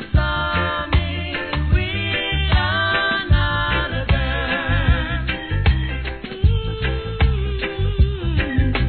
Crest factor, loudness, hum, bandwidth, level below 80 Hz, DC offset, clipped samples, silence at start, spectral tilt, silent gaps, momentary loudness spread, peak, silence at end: 16 dB; -20 LUFS; none; 4.5 kHz; -22 dBFS; 0.4%; under 0.1%; 0 s; -9 dB/octave; none; 6 LU; -4 dBFS; 0 s